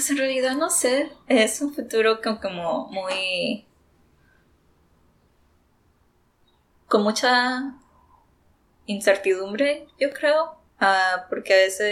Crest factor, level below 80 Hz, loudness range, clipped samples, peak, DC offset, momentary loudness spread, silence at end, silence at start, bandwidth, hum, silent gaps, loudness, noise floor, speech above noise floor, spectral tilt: 20 dB; -66 dBFS; 9 LU; under 0.1%; -4 dBFS; under 0.1%; 9 LU; 0 s; 0 s; 17 kHz; none; none; -22 LUFS; -63 dBFS; 41 dB; -2.5 dB/octave